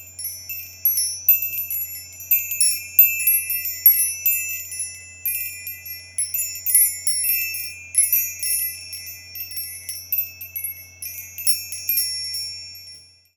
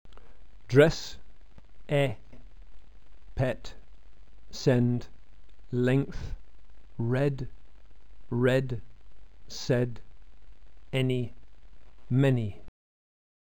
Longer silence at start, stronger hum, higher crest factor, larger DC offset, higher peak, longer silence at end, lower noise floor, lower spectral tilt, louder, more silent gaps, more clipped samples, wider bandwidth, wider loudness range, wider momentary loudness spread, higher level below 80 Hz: second, 0 s vs 0.15 s; neither; about the same, 24 dB vs 24 dB; second, under 0.1% vs 1%; first, 0 dBFS vs -6 dBFS; second, 0.35 s vs 0.7 s; second, -45 dBFS vs -53 dBFS; second, 2.5 dB/octave vs -7 dB/octave; first, -19 LUFS vs -28 LUFS; neither; neither; first, over 20 kHz vs 17.5 kHz; about the same, 7 LU vs 5 LU; about the same, 17 LU vs 18 LU; second, -66 dBFS vs -48 dBFS